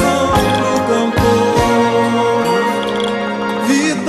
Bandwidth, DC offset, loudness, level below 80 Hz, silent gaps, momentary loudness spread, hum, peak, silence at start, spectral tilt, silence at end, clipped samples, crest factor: 13.5 kHz; under 0.1%; -14 LUFS; -34 dBFS; none; 5 LU; none; -2 dBFS; 0 s; -5 dB/octave; 0 s; under 0.1%; 12 dB